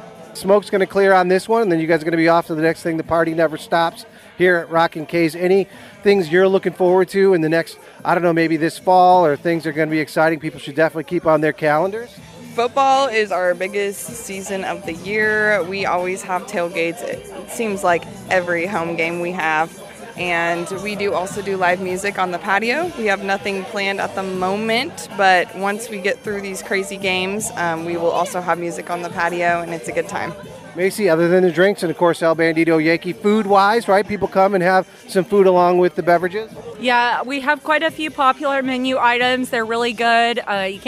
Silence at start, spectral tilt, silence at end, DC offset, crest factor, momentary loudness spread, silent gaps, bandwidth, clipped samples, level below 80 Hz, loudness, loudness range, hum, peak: 0 s; -5 dB/octave; 0 s; under 0.1%; 16 dB; 10 LU; none; 15.5 kHz; under 0.1%; -56 dBFS; -18 LUFS; 5 LU; none; -2 dBFS